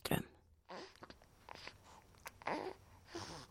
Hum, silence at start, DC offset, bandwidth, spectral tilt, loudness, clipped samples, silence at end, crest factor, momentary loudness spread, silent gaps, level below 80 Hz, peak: none; 0 s; under 0.1%; 16.5 kHz; -4.5 dB/octave; -48 LUFS; under 0.1%; 0 s; 28 dB; 18 LU; none; -66 dBFS; -20 dBFS